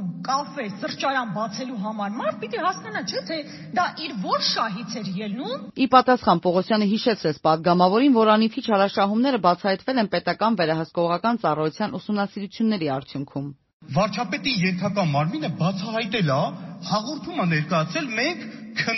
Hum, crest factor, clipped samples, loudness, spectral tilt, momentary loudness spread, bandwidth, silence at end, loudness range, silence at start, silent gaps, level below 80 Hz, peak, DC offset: none; 22 dB; under 0.1%; -23 LUFS; -4 dB/octave; 11 LU; 6.2 kHz; 0 s; 7 LU; 0 s; 13.73-13.80 s; -62 dBFS; -2 dBFS; under 0.1%